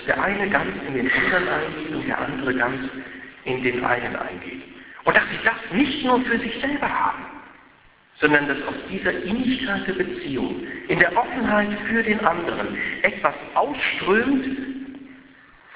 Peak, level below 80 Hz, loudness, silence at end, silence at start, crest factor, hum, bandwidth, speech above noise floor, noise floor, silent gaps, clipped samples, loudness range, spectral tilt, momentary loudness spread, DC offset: 0 dBFS; -50 dBFS; -22 LUFS; 0 s; 0 s; 22 dB; none; 4 kHz; 31 dB; -53 dBFS; none; under 0.1%; 2 LU; -8.5 dB/octave; 13 LU; under 0.1%